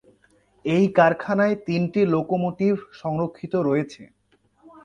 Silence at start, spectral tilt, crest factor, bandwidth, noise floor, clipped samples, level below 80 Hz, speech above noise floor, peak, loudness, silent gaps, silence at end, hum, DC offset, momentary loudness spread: 0.65 s; -8 dB/octave; 20 dB; 8.8 kHz; -61 dBFS; under 0.1%; -60 dBFS; 39 dB; -4 dBFS; -22 LUFS; none; 0.8 s; none; under 0.1%; 9 LU